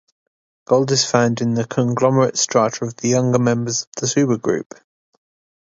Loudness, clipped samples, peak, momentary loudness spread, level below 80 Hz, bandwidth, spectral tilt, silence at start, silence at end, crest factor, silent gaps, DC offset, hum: -18 LUFS; under 0.1%; 0 dBFS; 6 LU; -60 dBFS; 7.8 kHz; -4.5 dB/octave; 0.7 s; 1.05 s; 18 dB; 3.87-3.92 s; under 0.1%; none